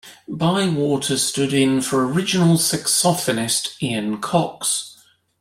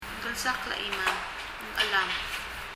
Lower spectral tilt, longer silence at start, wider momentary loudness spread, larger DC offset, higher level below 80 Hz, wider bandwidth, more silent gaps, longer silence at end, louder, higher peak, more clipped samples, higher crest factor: first, -4 dB/octave vs -1 dB/octave; about the same, 0.05 s vs 0 s; about the same, 7 LU vs 9 LU; neither; second, -58 dBFS vs -50 dBFS; about the same, 16 kHz vs 16 kHz; neither; first, 0.45 s vs 0 s; first, -19 LUFS vs -29 LUFS; first, -4 dBFS vs -12 dBFS; neither; about the same, 16 dB vs 20 dB